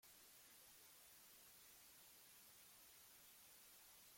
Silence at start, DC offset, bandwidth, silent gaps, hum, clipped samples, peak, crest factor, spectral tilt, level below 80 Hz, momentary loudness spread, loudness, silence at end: 0 s; under 0.1%; 16.5 kHz; none; none; under 0.1%; -54 dBFS; 12 dB; 0 dB/octave; under -90 dBFS; 0 LU; -64 LUFS; 0 s